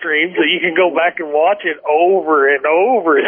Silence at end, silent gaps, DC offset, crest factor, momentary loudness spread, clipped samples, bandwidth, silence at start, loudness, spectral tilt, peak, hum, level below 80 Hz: 0 s; none; under 0.1%; 12 dB; 4 LU; under 0.1%; 3.6 kHz; 0 s; -14 LUFS; -7.5 dB/octave; -2 dBFS; none; -70 dBFS